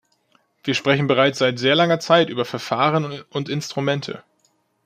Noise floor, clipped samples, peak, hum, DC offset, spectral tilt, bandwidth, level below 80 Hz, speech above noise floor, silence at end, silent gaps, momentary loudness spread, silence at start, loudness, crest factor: -65 dBFS; under 0.1%; -2 dBFS; none; under 0.1%; -5 dB/octave; 15 kHz; -64 dBFS; 45 dB; 0.65 s; none; 11 LU; 0.65 s; -20 LUFS; 18 dB